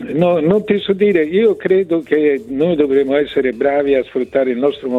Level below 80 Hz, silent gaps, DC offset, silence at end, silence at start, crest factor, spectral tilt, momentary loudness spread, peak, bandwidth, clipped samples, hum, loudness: -50 dBFS; none; under 0.1%; 0 s; 0 s; 12 dB; -8 dB/octave; 4 LU; -2 dBFS; 4.3 kHz; under 0.1%; none; -15 LUFS